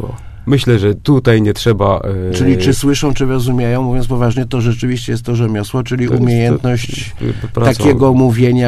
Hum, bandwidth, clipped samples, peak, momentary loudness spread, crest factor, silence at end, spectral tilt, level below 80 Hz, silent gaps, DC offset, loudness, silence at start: none; 14 kHz; under 0.1%; 0 dBFS; 8 LU; 12 dB; 0 s; -6.5 dB/octave; -30 dBFS; none; under 0.1%; -13 LUFS; 0 s